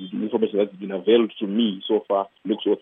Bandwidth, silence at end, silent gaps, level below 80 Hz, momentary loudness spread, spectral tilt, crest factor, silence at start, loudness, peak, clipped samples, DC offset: 3.8 kHz; 0.05 s; none; -82 dBFS; 7 LU; -9.5 dB/octave; 18 dB; 0 s; -23 LUFS; -6 dBFS; under 0.1%; under 0.1%